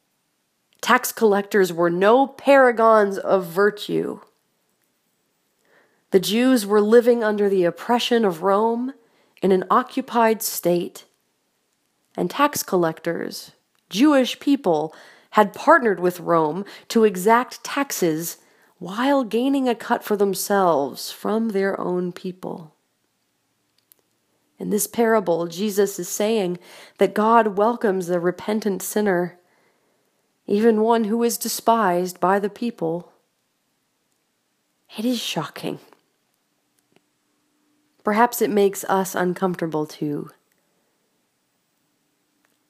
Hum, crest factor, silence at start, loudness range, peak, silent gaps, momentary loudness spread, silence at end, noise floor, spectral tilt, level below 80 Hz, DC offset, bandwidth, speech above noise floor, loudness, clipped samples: none; 22 dB; 0.85 s; 10 LU; 0 dBFS; none; 13 LU; 2.4 s; -70 dBFS; -4.5 dB/octave; -76 dBFS; under 0.1%; 15.5 kHz; 50 dB; -20 LUFS; under 0.1%